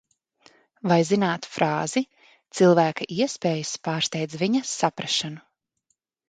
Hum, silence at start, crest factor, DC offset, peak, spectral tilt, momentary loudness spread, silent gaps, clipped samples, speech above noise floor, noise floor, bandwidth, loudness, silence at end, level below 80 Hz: none; 0.85 s; 20 dB; under 0.1%; -4 dBFS; -4.5 dB/octave; 10 LU; none; under 0.1%; 52 dB; -75 dBFS; 9.4 kHz; -24 LUFS; 0.9 s; -68 dBFS